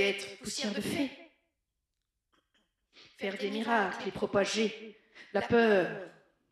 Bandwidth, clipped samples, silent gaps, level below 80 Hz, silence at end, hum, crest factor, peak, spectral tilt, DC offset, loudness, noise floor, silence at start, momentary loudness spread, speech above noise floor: 14 kHz; under 0.1%; none; -68 dBFS; 0.4 s; none; 20 dB; -14 dBFS; -4 dB/octave; under 0.1%; -31 LUFS; -85 dBFS; 0 s; 13 LU; 54 dB